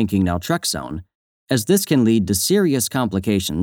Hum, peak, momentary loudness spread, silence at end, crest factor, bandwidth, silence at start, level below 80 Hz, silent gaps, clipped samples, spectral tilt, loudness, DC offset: none; -4 dBFS; 7 LU; 0 s; 16 dB; over 20 kHz; 0 s; -48 dBFS; 1.15-1.47 s; under 0.1%; -5 dB/octave; -19 LUFS; under 0.1%